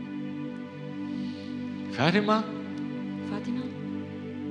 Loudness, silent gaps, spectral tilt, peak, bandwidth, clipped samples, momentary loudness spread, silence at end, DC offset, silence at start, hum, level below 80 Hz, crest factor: -31 LUFS; none; -6.5 dB/octave; -6 dBFS; 9.6 kHz; under 0.1%; 12 LU; 0 s; under 0.1%; 0 s; 50 Hz at -50 dBFS; -82 dBFS; 26 dB